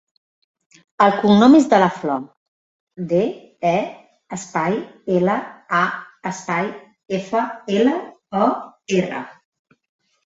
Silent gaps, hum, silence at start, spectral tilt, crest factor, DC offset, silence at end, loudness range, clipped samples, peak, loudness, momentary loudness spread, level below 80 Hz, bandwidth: 2.37-2.87 s; none; 1 s; -6 dB/octave; 18 dB; under 0.1%; 0.95 s; 6 LU; under 0.1%; -2 dBFS; -19 LUFS; 16 LU; -62 dBFS; 8 kHz